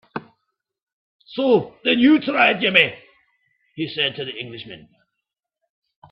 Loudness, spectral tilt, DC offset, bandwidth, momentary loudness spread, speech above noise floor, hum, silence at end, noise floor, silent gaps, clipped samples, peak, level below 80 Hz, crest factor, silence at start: -18 LUFS; -7 dB/octave; under 0.1%; 5.6 kHz; 20 LU; 63 dB; none; 1.35 s; -82 dBFS; 0.83-0.87 s, 0.93-1.20 s; under 0.1%; 0 dBFS; -66 dBFS; 22 dB; 0.15 s